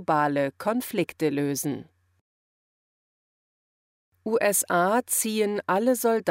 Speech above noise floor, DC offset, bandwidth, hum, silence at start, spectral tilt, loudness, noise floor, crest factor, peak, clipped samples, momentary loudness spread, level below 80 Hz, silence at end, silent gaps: over 65 dB; under 0.1%; 16 kHz; none; 0 s; -4 dB/octave; -25 LUFS; under -90 dBFS; 16 dB; -10 dBFS; under 0.1%; 7 LU; -72 dBFS; 0 s; 2.21-4.12 s